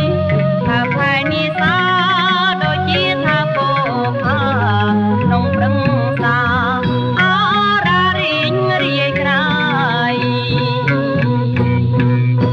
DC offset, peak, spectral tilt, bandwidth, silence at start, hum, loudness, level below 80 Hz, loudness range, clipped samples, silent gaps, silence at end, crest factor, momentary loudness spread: under 0.1%; -4 dBFS; -7.5 dB/octave; 6.8 kHz; 0 s; none; -14 LUFS; -42 dBFS; 1 LU; under 0.1%; none; 0 s; 10 dB; 3 LU